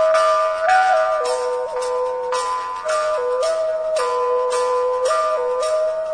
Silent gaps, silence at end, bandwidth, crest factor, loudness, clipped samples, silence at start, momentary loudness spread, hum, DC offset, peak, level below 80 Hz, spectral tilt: none; 0 s; 10 kHz; 14 dB; -19 LUFS; under 0.1%; 0 s; 7 LU; none; under 0.1%; -4 dBFS; -56 dBFS; 0 dB/octave